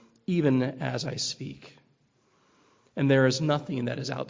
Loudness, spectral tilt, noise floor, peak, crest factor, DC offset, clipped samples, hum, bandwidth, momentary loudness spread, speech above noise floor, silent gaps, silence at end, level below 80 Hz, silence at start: -27 LUFS; -5.5 dB/octave; -67 dBFS; -10 dBFS; 18 dB; under 0.1%; under 0.1%; none; 7.6 kHz; 16 LU; 41 dB; none; 0 s; -66 dBFS; 0.3 s